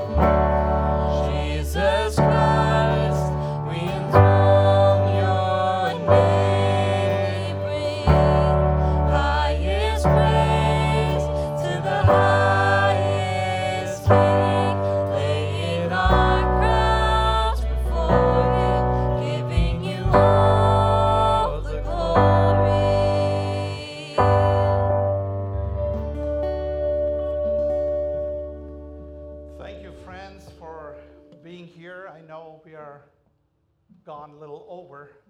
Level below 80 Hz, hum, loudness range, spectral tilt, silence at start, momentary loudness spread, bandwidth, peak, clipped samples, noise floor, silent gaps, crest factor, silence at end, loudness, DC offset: -30 dBFS; none; 8 LU; -7 dB/octave; 0 s; 22 LU; 12 kHz; 0 dBFS; under 0.1%; -68 dBFS; none; 20 dB; 0.25 s; -20 LUFS; under 0.1%